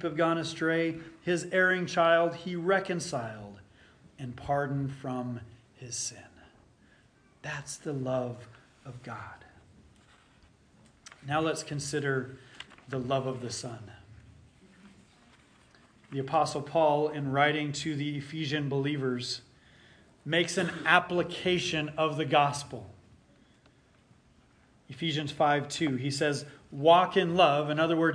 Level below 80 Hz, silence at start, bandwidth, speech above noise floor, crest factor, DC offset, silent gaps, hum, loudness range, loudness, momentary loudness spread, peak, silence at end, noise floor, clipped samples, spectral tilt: -66 dBFS; 0 s; 10.5 kHz; 33 dB; 24 dB; under 0.1%; none; none; 11 LU; -29 LUFS; 20 LU; -8 dBFS; 0 s; -62 dBFS; under 0.1%; -4.5 dB/octave